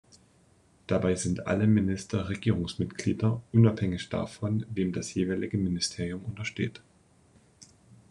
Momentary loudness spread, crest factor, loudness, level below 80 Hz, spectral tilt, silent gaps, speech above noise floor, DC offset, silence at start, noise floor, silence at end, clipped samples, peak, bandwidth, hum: 10 LU; 20 dB; -29 LUFS; -56 dBFS; -6 dB/octave; none; 34 dB; under 0.1%; 0.9 s; -62 dBFS; 0.45 s; under 0.1%; -10 dBFS; 11 kHz; none